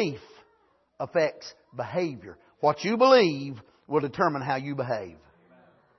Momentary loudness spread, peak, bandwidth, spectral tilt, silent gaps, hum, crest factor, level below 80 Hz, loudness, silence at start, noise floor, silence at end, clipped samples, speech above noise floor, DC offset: 23 LU; -4 dBFS; 6.2 kHz; -6 dB/octave; none; none; 22 dB; -70 dBFS; -26 LUFS; 0 s; -66 dBFS; 0.85 s; under 0.1%; 40 dB; under 0.1%